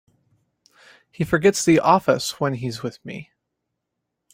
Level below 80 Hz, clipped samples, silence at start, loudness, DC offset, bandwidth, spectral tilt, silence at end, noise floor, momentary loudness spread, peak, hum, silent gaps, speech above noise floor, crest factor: -56 dBFS; under 0.1%; 1.2 s; -20 LUFS; under 0.1%; 16.5 kHz; -5 dB/octave; 1.1 s; -80 dBFS; 19 LU; -2 dBFS; none; none; 60 dB; 22 dB